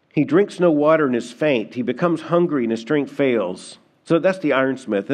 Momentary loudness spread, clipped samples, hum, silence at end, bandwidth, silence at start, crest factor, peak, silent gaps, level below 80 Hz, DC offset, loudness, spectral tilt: 7 LU; under 0.1%; none; 0 s; 10 kHz; 0.15 s; 16 dB; -4 dBFS; none; -74 dBFS; under 0.1%; -19 LUFS; -7 dB/octave